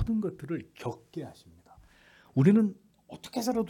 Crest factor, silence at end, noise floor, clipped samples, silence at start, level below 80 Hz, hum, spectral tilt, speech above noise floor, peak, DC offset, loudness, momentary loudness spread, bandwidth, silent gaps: 20 dB; 0 s; -59 dBFS; under 0.1%; 0 s; -54 dBFS; none; -7.5 dB/octave; 30 dB; -10 dBFS; under 0.1%; -29 LUFS; 22 LU; 18 kHz; none